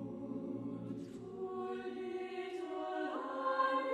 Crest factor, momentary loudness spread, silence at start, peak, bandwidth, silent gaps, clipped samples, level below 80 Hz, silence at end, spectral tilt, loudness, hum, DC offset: 18 dB; 11 LU; 0 s; -22 dBFS; 11 kHz; none; under 0.1%; -76 dBFS; 0 s; -6.5 dB/octave; -41 LUFS; none; under 0.1%